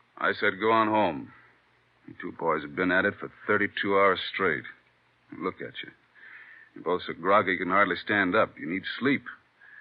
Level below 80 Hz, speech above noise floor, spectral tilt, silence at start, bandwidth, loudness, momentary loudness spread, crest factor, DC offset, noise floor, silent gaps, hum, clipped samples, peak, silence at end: -72 dBFS; 38 dB; -8.5 dB/octave; 0.15 s; 5.2 kHz; -26 LUFS; 18 LU; 20 dB; under 0.1%; -65 dBFS; none; none; under 0.1%; -8 dBFS; 0 s